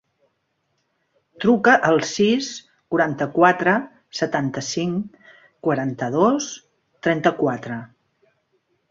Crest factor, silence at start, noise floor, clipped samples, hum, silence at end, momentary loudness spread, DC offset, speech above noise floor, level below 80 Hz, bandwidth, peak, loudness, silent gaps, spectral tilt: 20 dB; 1.4 s; -72 dBFS; under 0.1%; none; 1.05 s; 15 LU; under 0.1%; 52 dB; -62 dBFS; 7.8 kHz; -2 dBFS; -20 LUFS; none; -5 dB/octave